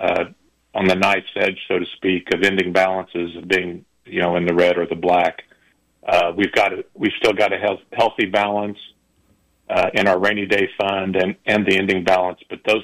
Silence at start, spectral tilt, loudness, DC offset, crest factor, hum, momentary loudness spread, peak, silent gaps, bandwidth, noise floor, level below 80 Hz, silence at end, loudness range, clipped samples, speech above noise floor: 0 s; -5 dB/octave; -19 LUFS; under 0.1%; 14 dB; none; 9 LU; -6 dBFS; none; 15.5 kHz; -60 dBFS; -56 dBFS; 0 s; 2 LU; under 0.1%; 42 dB